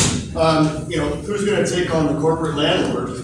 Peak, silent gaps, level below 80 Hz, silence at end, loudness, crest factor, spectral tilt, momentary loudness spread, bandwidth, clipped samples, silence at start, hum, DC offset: -4 dBFS; none; -38 dBFS; 0 s; -19 LUFS; 14 dB; -4.5 dB/octave; 6 LU; 12.5 kHz; under 0.1%; 0 s; none; under 0.1%